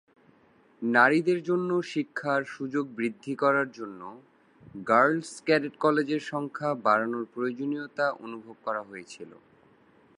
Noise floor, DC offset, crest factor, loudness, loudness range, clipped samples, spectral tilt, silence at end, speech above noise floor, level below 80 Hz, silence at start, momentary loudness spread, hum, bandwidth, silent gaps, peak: -61 dBFS; under 0.1%; 22 dB; -27 LUFS; 4 LU; under 0.1%; -6 dB/octave; 0.85 s; 34 dB; -78 dBFS; 0.8 s; 19 LU; none; 11 kHz; none; -6 dBFS